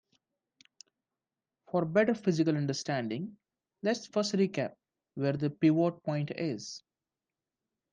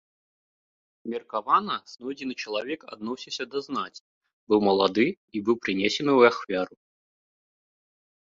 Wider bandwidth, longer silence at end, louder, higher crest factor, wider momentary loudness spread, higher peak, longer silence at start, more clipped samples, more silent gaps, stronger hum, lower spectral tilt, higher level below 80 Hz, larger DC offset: first, 9.6 kHz vs 7.6 kHz; second, 1.15 s vs 1.65 s; second, -31 LUFS vs -26 LUFS; about the same, 20 dB vs 22 dB; second, 12 LU vs 15 LU; second, -14 dBFS vs -4 dBFS; first, 1.75 s vs 1.05 s; neither; second, none vs 4.01-4.21 s, 4.33-4.47 s, 5.17-5.28 s; neither; about the same, -6 dB/octave vs -5 dB/octave; second, -76 dBFS vs -68 dBFS; neither